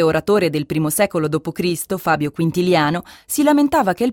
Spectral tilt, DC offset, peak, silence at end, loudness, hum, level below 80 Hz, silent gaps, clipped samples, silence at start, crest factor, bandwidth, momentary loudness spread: -5 dB/octave; under 0.1%; -2 dBFS; 0 s; -18 LUFS; none; -52 dBFS; none; under 0.1%; 0 s; 14 dB; 17.5 kHz; 7 LU